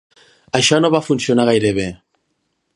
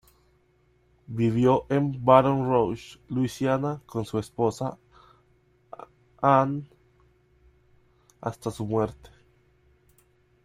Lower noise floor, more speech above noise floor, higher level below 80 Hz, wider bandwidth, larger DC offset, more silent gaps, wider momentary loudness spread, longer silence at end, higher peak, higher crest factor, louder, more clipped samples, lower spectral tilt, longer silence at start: first, -69 dBFS vs -64 dBFS; first, 54 dB vs 40 dB; first, -50 dBFS vs -58 dBFS; second, 11.5 kHz vs 14 kHz; neither; neither; second, 9 LU vs 17 LU; second, 0.8 s vs 1.5 s; first, 0 dBFS vs -4 dBFS; second, 18 dB vs 24 dB; first, -16 LUFS vs -25 LUFS; neither; second, -4.5 dB/octave vs -7.5 dB/octave; second, 0.55 s vs 1.1 s